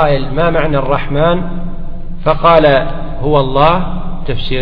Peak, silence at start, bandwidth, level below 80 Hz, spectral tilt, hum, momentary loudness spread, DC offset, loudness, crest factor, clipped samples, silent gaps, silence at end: 0 dBFS; 0 s; 5 kHz; -20 dBFS; -9.5 dB/octave; none; 15 LU; under 0.1%; -13 LUFS; 12 dB; 0.1%; none; 0 s